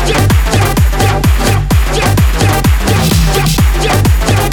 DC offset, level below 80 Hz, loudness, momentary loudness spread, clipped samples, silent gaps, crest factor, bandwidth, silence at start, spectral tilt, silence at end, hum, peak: under 0.1%; -14 dBFS; -10 LUFS; 1 LU; under 0.1%; none; 8 dB; 19.5 kHz; 0 s; -5 dB/octave; 0 s; none; 0 dBFS